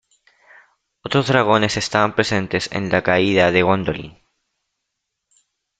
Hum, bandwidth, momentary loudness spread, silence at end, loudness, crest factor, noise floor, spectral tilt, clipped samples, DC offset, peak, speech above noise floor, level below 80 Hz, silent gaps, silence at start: none; 9.2 kHz; 10 LU; 1.7 s; -18 LUFS; 20 dB; -78 dBFS; -5 dB/octave; under 0.1%; under 0.1%; -2 dBFS; 60 dB; -52 dBFS; none; 1.05 s